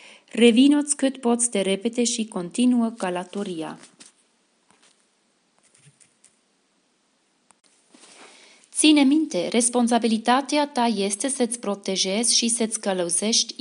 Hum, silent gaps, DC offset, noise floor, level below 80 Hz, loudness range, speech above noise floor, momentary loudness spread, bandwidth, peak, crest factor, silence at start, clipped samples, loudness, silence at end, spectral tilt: none; none; under 0.1%; -67 dBFS; -80 dBFS; 11 LU; 45 dB; 12 LU; 11.5 kHz; -2 dBFS; 20 dB; 0.35 s; under 0.1%; -21 LUFS; 0.1 s; -2.5 dB/octave